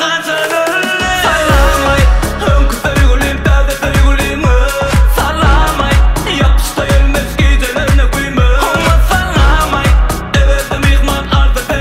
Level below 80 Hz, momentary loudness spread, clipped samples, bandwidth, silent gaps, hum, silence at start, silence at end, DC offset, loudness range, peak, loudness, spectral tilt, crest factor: -12 dBFS; 3 LU; under 0.1%; 16 kHz; none; none; 0 s; 0 s; under 0.1%; 1 LU; 0 dBFS; -11 LUFS; -5 dB/octave; 10 dB